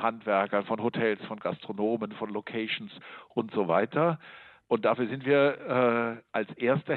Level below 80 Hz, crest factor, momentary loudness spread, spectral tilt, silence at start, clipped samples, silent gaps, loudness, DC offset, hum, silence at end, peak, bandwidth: -76 dBFS; 18 dB; 10 LU; -9 dB/octave; 0 s; under 0.1%; none; -29 LUFS; under 0.1%; none; 0 s; -12 dBFS; 4.4 kHz